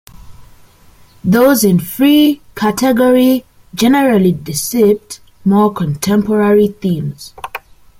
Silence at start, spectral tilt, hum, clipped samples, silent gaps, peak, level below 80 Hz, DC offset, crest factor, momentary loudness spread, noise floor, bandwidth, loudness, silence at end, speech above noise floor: 0.25 s; -5.5 dB/octave; none; under 0.1%; none; 0 dBFS; -46 dBFS; under 0.1%; 12 dB; 16 LU; -44 dBFS; 16.5 kHz; -12 LUFS; 0.4 s; 32 dB